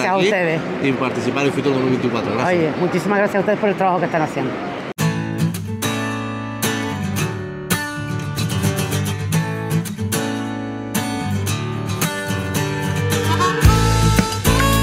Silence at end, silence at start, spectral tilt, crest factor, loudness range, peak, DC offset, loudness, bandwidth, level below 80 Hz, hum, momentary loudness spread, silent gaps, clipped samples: 0 s; 0 s; -5 dB/octave; 18 dB; 4 LU; -2 dBFS; under 0.1%; -19 LUFS; 16 kHz; -32 dBFS; none; 8 LU; none; under 0.1%